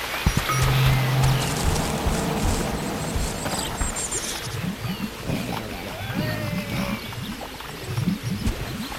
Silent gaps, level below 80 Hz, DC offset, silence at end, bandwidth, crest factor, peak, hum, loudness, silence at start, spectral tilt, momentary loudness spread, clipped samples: none; -34 dBFS; under 0.1%; 0 s; 16.5 kHz; 20 dB; -4 dBFS; none; -25 LUFS; 0 s; -4.5 dB/octave; 10 LU; under 0.1%